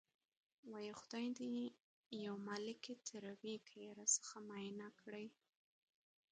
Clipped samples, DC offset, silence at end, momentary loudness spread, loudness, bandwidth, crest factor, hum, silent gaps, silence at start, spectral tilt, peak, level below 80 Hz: under 0.1%; under 0.1%; 1 s; 15 LU; -47 LUFS; 9 kHz; 26 dB; none; 1.82-2.11 s; 0.65 s; -2.5 dB/octave; -24 dBFS; under -90 dBFS